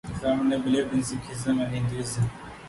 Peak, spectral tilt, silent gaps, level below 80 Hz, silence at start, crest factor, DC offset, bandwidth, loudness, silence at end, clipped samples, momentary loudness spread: -14 dBFS; -6 dB/octave; none; -48 dBFS; 0.05 s; 14 dB; under 0.1%; 11.5 kHz; -27 LUFS; 0 s; under 0.1%; 6 LU